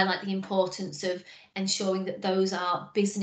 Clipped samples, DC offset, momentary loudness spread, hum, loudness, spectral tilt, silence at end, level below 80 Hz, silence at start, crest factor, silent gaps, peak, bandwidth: under 0.1%; under 0.1%; 6 LU; none; -29 LUFS; -4 dB/octave; 0 s; -76 dBFS; 0 s; 22 dB; none; -8 dBFS; 9.2 kHz